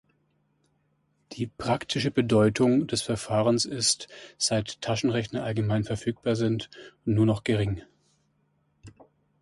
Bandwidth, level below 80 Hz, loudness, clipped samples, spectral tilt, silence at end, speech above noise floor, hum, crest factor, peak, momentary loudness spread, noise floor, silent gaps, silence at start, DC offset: 11.5 kHz; -54 dBFS; -26 LUFS; under 0.1%; -5 dB/octave; 0.5 s; 45 dB; none; 18 dB; -10 dBFS; 11 LU; -71 dBFS; none; 1.3 s; under 0.1%